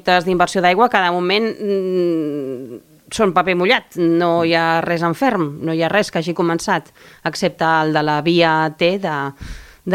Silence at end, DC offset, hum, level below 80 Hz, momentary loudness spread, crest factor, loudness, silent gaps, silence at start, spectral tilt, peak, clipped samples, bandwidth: 0 s; under 0.1%; none; -48 dBFS; 11 LU; 16 dB; -17 LUFS; none; 0.05 s; -5 dB/octave; 0 dBFS; under 0.1%; 16 kHz